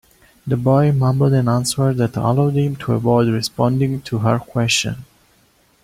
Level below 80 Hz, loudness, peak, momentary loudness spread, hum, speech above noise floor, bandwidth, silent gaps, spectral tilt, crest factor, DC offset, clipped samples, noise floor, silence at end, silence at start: -48 dBFS; -17 LUFS; -2 dBFS; 5 LU; none; 40 dB; 15.5 kHz; none; -6 dB/octave; 16 dB; under 0.1%; under 0.1%; -56 dBFS; 0.8 s; 0.45 s